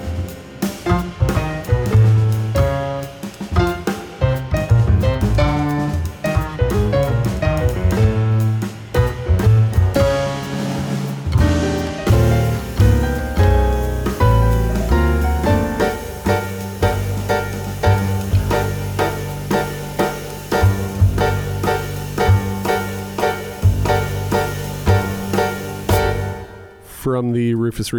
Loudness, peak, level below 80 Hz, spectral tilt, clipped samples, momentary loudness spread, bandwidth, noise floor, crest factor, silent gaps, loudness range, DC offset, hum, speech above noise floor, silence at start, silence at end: -18 LUFS; -2 dBFS; -26 dBFS; -6.5 dB/octave; under 0.1%; 8 LU; over 20 kHz; -37 dBFS; 14 dB; none; 3 LU; under 0.1%; none; 18 dB; 0 s; 0 s